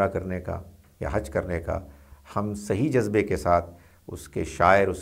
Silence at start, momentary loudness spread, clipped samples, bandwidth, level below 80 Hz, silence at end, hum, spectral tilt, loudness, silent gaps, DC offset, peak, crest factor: 0 s; 15 LU; under 0.1%; 16 kHz; -44 dBFS; 0 s; none; -6.5 dB/octave; -26 LUFS; none; under 0.1%; -4 dBFS; 22 dB